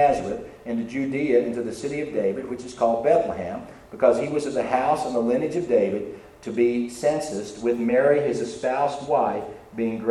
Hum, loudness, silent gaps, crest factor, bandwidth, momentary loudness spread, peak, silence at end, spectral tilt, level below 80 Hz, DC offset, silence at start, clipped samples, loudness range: none; -24 LUFS; none; 18 dB; 12.5 kHz; 11 LU; -6 dBFS; 0 s; -6 dB/octave; -56 dBFS; under 0.1%; 0 s; under 0.1%; 1 LU